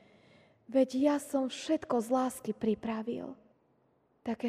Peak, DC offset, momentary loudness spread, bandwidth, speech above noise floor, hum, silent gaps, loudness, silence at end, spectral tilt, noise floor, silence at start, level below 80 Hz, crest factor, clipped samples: -16 dBFS; under 0.1%; 11 LU; 15.5 kHz; 40 dB; none; none; -32 LUFS; 0 s; -5 dB/octave; -71 dBFS; 0.7 s; -72 dBFS; 18 dB; under 0.1%